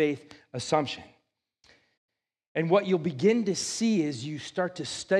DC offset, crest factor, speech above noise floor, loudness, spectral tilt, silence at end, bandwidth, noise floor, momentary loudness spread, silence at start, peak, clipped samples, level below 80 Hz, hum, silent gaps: under 0.1%; 20 dB; 46 dB; -28 LUFS; -5 dB/octave; 0 s; 12.5 kHz; -73 dBFS; 12 LU; 0 s; -10 dBFS; under 0.1%; -72 dBFS; none; 1.97-2.09 s, 2.47-2.55 s